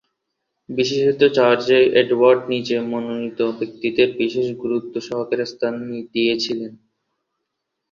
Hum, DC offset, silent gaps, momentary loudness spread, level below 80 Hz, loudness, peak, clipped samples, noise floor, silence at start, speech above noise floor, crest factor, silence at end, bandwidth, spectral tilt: none; under 0.1%; none; 11 LU; -64 dBFS; -19 LUFS; -2 dBFS; under 0.1%; -78 dBFS; 0.7 s; 59 dB; 18 dB; 1.15 s; 7.4 kHz; -5 dB/octave